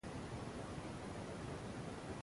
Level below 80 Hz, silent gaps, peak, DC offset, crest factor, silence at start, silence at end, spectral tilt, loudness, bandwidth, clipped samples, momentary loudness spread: -60 dBFS; none; -34 dBFS; under 0.1%; 14 dB; 0.05 s; 0 s; -5.5 dB/octave; -48 LUFS; 11.5 kHz; under 0.1%; 1 LU